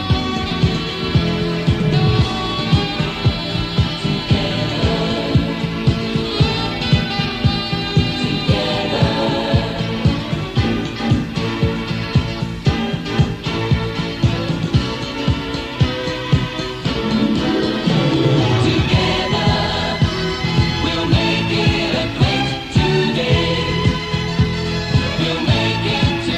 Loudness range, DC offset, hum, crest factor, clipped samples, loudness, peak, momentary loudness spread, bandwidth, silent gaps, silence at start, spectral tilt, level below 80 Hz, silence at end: 3 LU; under 0.1%; none; 16 dB; under 0.1%; -18 LUFS; -2 dBFS; 5 LU; 12 kHz; none; 0 s; -6 dB/octave; -30 dBFS; 0 s